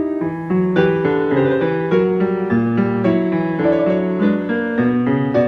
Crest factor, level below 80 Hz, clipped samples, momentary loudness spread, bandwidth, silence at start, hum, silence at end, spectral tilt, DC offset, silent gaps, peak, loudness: 16 dB; -50 dBFS; under 0.1%; 3 LU; 6 kHz; 0 s; none; 0 s; -9.5 dB/octave; under 0.1%; none; -2 dBFS; -17 LUFS